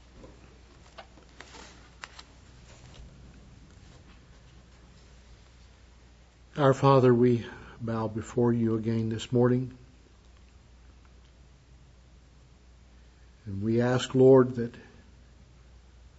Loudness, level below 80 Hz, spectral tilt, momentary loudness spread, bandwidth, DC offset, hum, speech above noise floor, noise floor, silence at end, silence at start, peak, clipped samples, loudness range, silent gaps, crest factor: -25 LUFS; -56 dBFS; -7.5 dB/octave; 27 LU; 8 kHz; under 0.1%; none; 32 dB; -56 dBFS; 1.4 s; 0.25 s; -8 dBFS; under 0.1%; 24 LU; none; 22 dB